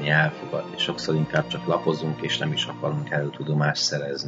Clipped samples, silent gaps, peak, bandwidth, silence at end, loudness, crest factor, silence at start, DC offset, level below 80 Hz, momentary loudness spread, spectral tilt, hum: under 0.1%; none; -6 dBFS; 7.8 kHz; 0 s; -25 LUFS; 20 dB; 0 s; under 0.1%; -60 dBFS; 6 LU; -4.5 dB/octave; none